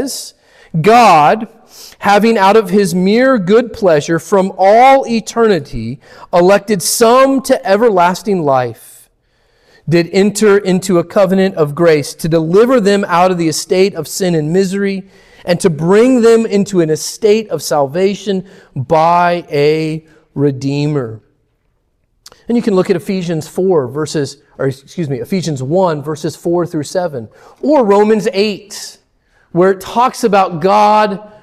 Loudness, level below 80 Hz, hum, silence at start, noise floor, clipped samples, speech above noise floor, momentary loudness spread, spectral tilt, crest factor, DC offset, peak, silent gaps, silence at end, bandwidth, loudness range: -12 LUFS; -46 dBFS; none; 0 s; -60 dBFS; under 0.1%; 49 dB; 12 LU; -5.5 dB/octave; 12 dB; under 0.1%; 0 dBFS; none; 0.15 s; 15 kHz; 6 LU